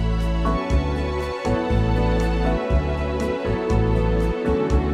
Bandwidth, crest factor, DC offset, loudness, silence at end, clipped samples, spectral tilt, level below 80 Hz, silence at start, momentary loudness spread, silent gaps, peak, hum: 10 kHz; 12 dB; under 0.1%; -22 LUFS; 0 s; under 0.1%; -7.5 dB/octave; -24 dBFS; 0 s; 4 LU; none; -8 dBFS; none